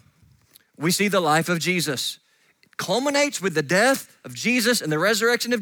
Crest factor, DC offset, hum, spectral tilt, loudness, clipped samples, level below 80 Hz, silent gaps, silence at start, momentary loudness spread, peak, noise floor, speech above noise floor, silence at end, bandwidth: 18 dB; under 0.1%; none; -3.5 dB/octave; -21 LUFS; under 0.1%; -72 dBFS; none; 0.8 s; 9 LU; -6 dBFS; -61 dBFS; 40 dB; 0 s; over 20 kHz